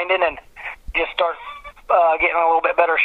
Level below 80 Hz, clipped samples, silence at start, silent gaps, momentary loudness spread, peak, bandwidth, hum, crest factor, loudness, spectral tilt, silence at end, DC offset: -44 dBFS; under 0.1%; 0 s; none; 17 LU; 0 dBFS; 5 kHz; none; 18 dB; -18 LUFS; -4.5 dB/octave; 0 s; under 0.1%